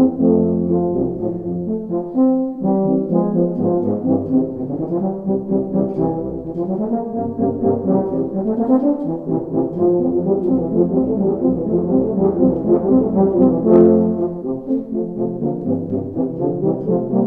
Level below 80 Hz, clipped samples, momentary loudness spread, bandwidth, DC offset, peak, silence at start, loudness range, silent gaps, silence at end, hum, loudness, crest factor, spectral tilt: -46 dBFS; under 0.1%; 8 LU; 2.1 kHz; under 0.1%; 0 dBFS; 0 s; 5 LU; none; 0 s; none; -18 LUFS; 18 dB; -13.5 dB/octave